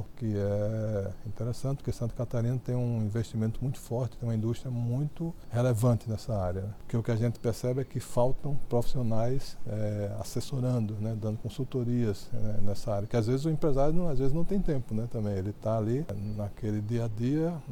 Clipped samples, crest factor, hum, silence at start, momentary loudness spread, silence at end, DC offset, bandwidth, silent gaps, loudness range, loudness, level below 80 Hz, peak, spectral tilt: under 0.1%; 16 dB; none; 0 s; 6 LU; 0 s; under 0.1%; 15 kHz; none; 2 LU; -32 LUFS; -40 dBFS; -14 dBFS; -8 dB/octave